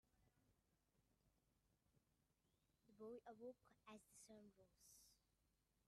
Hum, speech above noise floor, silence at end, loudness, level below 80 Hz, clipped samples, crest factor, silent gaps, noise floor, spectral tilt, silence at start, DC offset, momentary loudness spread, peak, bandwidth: none; 22 dB; 0 s; -64 LUFS; -90 dBFS; under 0.1%; 18 dB; none; -87 dBFS; -4 dB/octave; 0.05 s; under 0.1%; 9 LU; -50 dBFS; 13.5 kHz